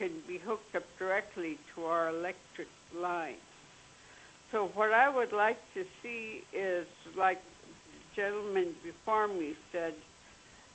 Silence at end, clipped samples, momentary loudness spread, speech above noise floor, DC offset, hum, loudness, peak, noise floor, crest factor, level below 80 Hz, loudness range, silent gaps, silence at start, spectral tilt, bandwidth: 0.15 s; under 0.1%; 20 LU; 24 dB; under 0.1%; none; -34 LUFS; -14 dBFS; -58 dBFS; 22 dB; -72 dBFS; 5 LU; none; 0 s; -4.5 dB/octave; 8.4 kHz